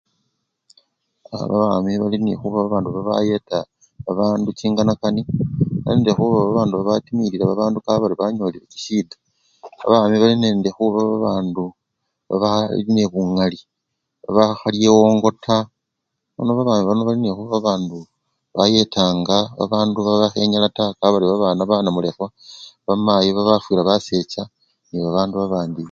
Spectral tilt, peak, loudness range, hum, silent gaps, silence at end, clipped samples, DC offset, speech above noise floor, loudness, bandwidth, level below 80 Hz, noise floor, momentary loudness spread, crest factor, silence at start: -6.5 dB/octave; 0 dBFS; 3 LU; none; none; 0 s; under 0.1%; under 0.1%; 60 dB; -18 LUFS; 7.2 kHz; -52 dBFS; -78 dBFS; 12 LU; 18 dB; 1.3 s